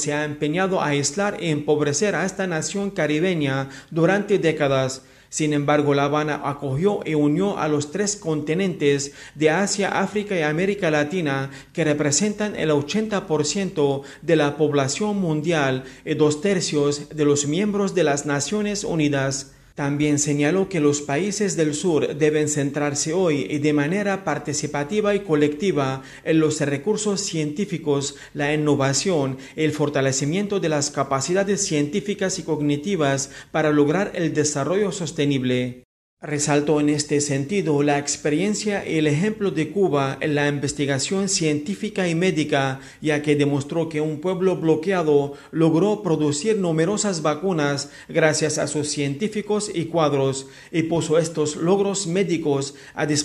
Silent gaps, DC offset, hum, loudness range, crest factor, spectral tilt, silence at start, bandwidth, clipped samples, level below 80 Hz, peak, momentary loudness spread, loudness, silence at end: 35.85-36.17 s; under 0.1%; none; 1 LU; 20 dB; -4.5 dB/octave; 0 s; 12.5 kHz; under 0.1%; -56 dBFS; -2 dBFS; 5 LU; -22 LUFS; 0 s